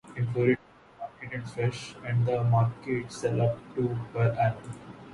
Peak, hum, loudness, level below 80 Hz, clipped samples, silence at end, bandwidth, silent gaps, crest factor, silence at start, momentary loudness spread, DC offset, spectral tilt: -10 dBFS; none; -29 LUFS; -58 dBFS; under 0.1%; 0 s; 11 kHz; none; 18 dB; 0.05 s; 15 LU; under 0.1%; -7.5 dB/octave